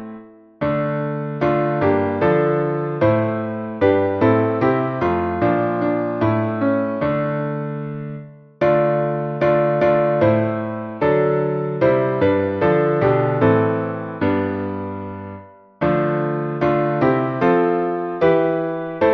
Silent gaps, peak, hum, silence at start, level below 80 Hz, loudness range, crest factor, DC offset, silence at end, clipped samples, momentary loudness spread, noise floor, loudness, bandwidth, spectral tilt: none; -2 dBFS; none; 0 s; -50 dBFS; 3 LU; 16 dB; under 0.1%; 0 s; under 0.1%; 9 LU; -40 dBFS; -19 LUFS; 6 kHz; -10 dB/octave